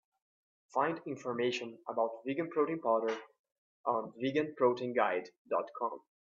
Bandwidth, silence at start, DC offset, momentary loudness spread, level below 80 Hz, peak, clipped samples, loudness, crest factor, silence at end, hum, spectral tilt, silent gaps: 7.6 kHz; 0.75 s; under 0.1%; 8 LU; -82 dBFS; -16 dBFS; under 0.1%; -35 LUFS; 20 dB; 0.35 s; none; -5.5 dB/octave; 3.39-3.44 s, 3.58-3.84 s, 5.38-5.45 s